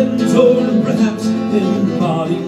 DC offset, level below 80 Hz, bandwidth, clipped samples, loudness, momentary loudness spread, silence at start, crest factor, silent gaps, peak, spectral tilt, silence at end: under 0.1%; -56 dBFS; 12.5 kHz; under 0.1%; -14 LUFS; 5 LU; 0 s; 14 dB; none; 0 dBFS; -7 dB/octave; 0 s